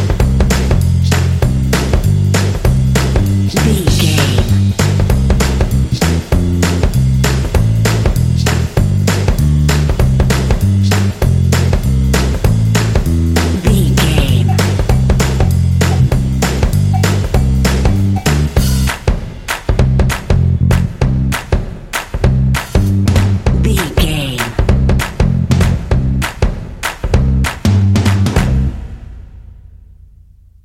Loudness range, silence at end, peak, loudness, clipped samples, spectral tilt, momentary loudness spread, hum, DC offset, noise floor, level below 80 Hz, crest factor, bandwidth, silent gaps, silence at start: 2 LU; 1.05 s; 0 dBFS; -13 LUFS; under 0.1%; -6 dB/octave; 4 LU; none; under 0.1%; -41 dBFS; -18 dBFS; 12 dB; 16.5 kHz; none; 0 s